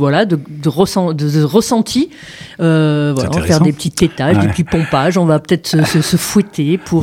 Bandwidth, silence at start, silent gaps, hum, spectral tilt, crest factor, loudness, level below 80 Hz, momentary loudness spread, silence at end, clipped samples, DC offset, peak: 16.5 kHz; 0 s; none; none; -6 dB/octave; 12 dB; -14 LUFS; -40 dBFS; 5 LU; 0 s; under 0.1%; under 0.1%; 0 dBFS